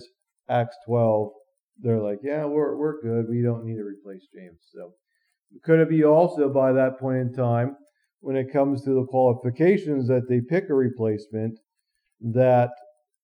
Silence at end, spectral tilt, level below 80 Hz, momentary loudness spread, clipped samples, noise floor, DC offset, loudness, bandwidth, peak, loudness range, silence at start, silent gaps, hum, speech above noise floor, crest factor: 0.5 s; -10 dB/octave; -78 dBFS; 13 LU; under 0.1%; -77 dBFS; under 0.1%; -23 LUFS; 9.2 kHz; -6 dBFS; 5 LU; 0 s; 1.63-1.67 s; none; 55 dB; 18 dB